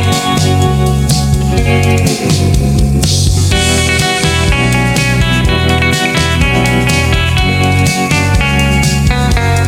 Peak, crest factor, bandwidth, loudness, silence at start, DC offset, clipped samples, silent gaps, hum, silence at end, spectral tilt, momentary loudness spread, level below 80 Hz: 0 dBFS; 10 dB; 17 kHz; -10 LUFS; 0 s; under 0.1%; under 0.1%; none; none; 0 s; -4.5 dB/octave; 1 LU; -18 dBFS